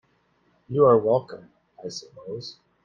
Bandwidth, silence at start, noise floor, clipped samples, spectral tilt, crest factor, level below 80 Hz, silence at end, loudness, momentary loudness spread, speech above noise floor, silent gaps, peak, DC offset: 7.4 kHz; 0.7 s; -66 dBFS; under 0.1%; -7 dB/octave; 20 dB; -64 dBFS; 0.35 s; -21 LUFS; 23 LU; 43 dB; none; -6 dBFS; under 0.1%